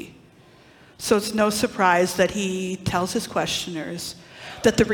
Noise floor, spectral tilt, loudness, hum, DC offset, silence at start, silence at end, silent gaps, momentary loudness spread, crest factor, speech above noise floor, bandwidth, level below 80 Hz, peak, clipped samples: -51 dBFS; -4 dB/octave; -23 LUFS; none; under 0.1%; 0 s; 0 s; none; 14 LU; 18 dB; 29 dB; 18 kHz; -50 dBFS; -4 dBFS; under 0.1%